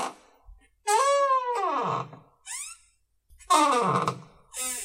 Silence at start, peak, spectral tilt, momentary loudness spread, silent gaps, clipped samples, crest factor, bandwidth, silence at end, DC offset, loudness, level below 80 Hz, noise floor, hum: 0 s; -8 dBFS; -3 dB/octave; 18 LU; none; under 0.1%; 20 dB; 16 kHz; 0 s; under 0.1%; -25 LUFS; -62 dBFS; -66 dBFS; none